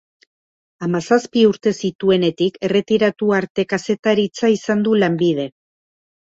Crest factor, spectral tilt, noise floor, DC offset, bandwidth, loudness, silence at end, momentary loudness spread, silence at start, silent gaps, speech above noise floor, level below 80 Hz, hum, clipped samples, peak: 16 dB; -6 dB/octave; under -90 dBFS; under 0.1%; 8 kHz; -18 LUFS; 0.8 s; 6 LU; 0.8 s; 1.95-1.99 s, 3.50-3.55 s, 3.99-4.03 s; over 73 dB; -60 dBFS; none; under 0.1%; -2 dBFS